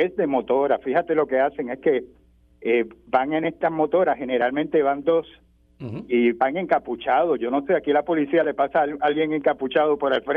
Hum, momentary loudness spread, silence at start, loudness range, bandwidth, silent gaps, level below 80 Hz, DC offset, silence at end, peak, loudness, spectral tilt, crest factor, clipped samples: none; 4 LU; 0 s; 2 LU; 4.7 kHz; none; -60 dBFS; under 0.1%; 0 s; -6 dBFS; -22 LUFS; -8.5 dB/octave; 16 dB; under 0.1%